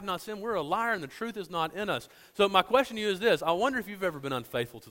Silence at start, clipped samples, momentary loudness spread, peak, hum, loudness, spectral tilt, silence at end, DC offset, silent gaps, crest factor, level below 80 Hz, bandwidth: 0 s; under 0.1%; 10 LU; -8 dBFS; none; -29 LUFS; -4.5 dB/octave; 0 s; under 0.1%; none; 22 dB; -62 dBFS; 16.5 kHz